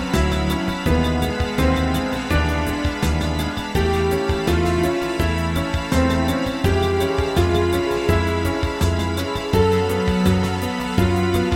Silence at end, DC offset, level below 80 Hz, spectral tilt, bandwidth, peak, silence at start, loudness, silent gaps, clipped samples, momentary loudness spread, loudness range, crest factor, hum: 0 s; under 0.1%; -28 dBFS; -6 dB/octave; 16.5 kHz; -2 dBFS; 0 s; -20 LUFS; none; under 0.1%; 4 LU; 1 LU; 16 dB; none